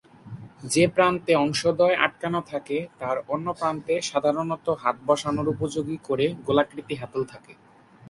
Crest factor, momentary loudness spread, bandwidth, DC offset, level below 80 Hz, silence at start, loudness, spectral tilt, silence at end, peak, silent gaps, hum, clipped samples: 22 dB; 11 LU; 11.5 kHz; under 0.1%; -60 dBFS; 0.25 s; -25 LUFS; -5 dB/octave; 0 s; -2 dBFS; none; none; under 0.1%